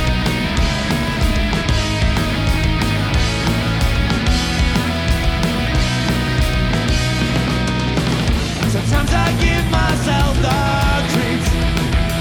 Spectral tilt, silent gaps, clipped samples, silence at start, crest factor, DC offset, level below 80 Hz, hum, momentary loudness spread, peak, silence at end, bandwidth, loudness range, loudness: -5 dB/octave; none; under 0.1%; 0 s; 14 dB; under 0.1%; -22 dBFS; none; 2 LU; -2 dBFS; 0 s; over 20 kHz; 1 LU; -17 LUFS